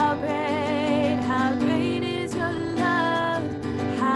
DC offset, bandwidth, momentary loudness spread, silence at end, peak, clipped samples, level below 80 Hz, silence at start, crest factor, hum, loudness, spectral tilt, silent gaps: under 0.1%; 11.5 kHz; 5 LU; 0 s; -10 dBFS; under 0.1%; -56 dBFS; 0 s; 14 dB; none; -24 LUFS; -6 dB/octave; none